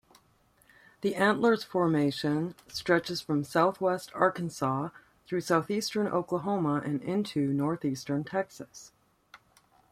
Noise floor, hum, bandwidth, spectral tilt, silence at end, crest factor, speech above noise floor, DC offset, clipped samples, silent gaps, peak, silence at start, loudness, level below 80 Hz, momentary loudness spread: -66 dBFS; none; 15.5 kHz; -6 dB/octave; 0.55 s; 20 dB; 37 dB; under 0.1%; under 0.1%; none; -10 dBFS; 1 s; -29 LUFS; -68 dBFS; 9 LU